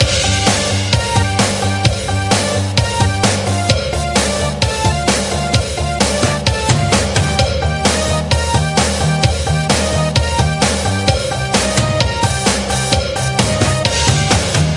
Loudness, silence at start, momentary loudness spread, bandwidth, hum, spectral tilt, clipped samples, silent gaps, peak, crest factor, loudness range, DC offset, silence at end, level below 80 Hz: -14 LUFS; 0 s; 3 LU; 11.5 kHz; none; -4 dB/octave; under 0.1%; none; 0 dBFS; 14 dB; 1 LU; under 0.1%; 0 s; -26 dBFS